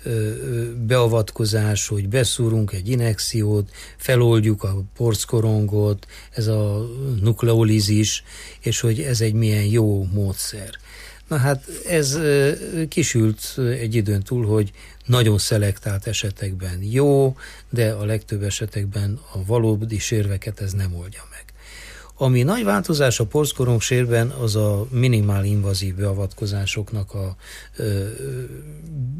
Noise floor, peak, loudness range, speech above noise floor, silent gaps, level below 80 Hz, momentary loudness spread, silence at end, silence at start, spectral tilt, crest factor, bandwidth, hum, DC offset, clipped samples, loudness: -40 dBFS; -6 dBFS; 4 LU; 20 dB; none; -42 dBFS; 12 LU; 0 s; 0 s; -5.5 dB/octave; 14 dB; 15.5 kHz; none; under 0.1%; under 0.1%; -21 LUFS